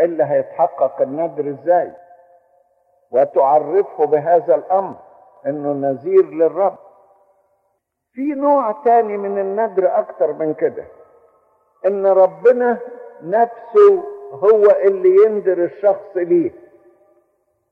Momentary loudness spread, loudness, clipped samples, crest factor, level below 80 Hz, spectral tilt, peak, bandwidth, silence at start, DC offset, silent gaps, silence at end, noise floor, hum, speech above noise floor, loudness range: 11 LU; -16 LUFS; under 0.1%; 14 dB; -72 dBFS; -9.5 dB/octave; -2 dBFS; 3.7 kHz; 0 s; under 0.1%; none; 1.2 s; -70 dBFS; none; 54 dB; 6 LU